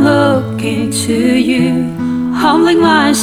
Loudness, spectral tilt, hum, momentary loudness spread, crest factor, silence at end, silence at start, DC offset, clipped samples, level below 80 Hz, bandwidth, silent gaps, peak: -12 LUFS; -5 dB/octave; none; 7 LU; 12 dB; 0 s; 0 s; under 0.1%; under 0.1%; -46 dBFS; 18.5 kHz; none; 0 dBFS